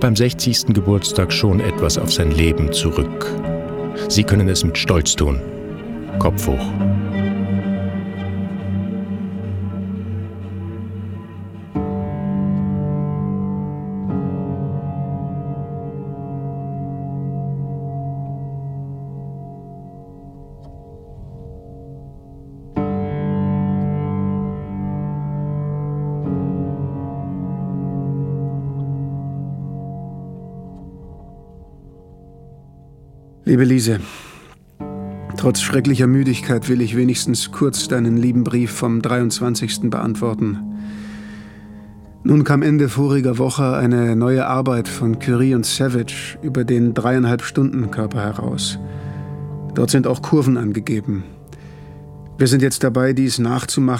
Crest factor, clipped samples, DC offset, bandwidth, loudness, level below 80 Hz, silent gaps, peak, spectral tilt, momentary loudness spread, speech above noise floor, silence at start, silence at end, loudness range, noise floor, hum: 20 dB; under 0.1%; under 0.1%; 16.5 kHz; -20 LUFS; -36 dBFS; none; 0 dBFS; -5.5 dB/octave; 19 LU; 27 dB; 0 s; 0 s; 11 LU; -43 dBFS; none